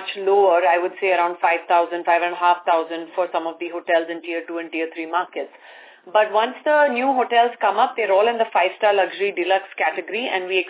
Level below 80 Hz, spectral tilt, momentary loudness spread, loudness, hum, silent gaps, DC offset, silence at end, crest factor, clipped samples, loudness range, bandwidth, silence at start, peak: under -90 dBFS; -6.5 dB/octave; 10 LU; -20 LUFS; none; none; under 0.1%; 0 s; 16 dB; under 0.1%; 5 LU; 4 kHz; 0 s; -4 dBFS